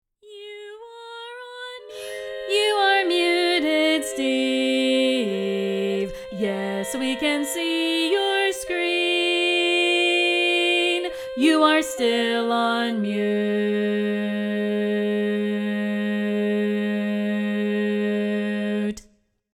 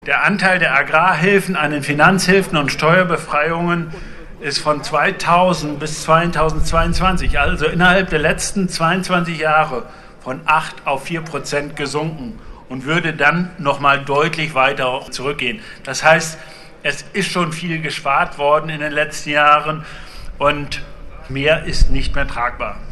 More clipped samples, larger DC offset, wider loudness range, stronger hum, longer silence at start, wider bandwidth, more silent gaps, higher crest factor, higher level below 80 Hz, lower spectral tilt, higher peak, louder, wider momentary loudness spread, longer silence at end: neither; neither; about the same, 4 LU vs 5 LU; neither; first, 0.25 s vs 0 s; first, 16.5 kHz vs 13 kHz; neither; about the same, 18 dB vs 16 dB; second, -60 dBFS vs -28 dBFS; about the same, -4 dB/octave vs -4.5 dB/octave; second, -6 dBFS vs 0 dBFS; second, -22 LUFS vs -16 LUFS; about the same, 15 LU vs 13 LU; first, 0.6 s vs 0 s